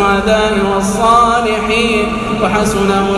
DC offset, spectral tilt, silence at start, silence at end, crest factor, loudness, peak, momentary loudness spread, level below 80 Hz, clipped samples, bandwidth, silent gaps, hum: under 0.1%; -4.5 dB/octave; 0 s; 0 s; 12 dB; -12 LUFS; 0 dBFS; 5 LU; -30 dBFS; under 0.1%; 14 kHz; none; none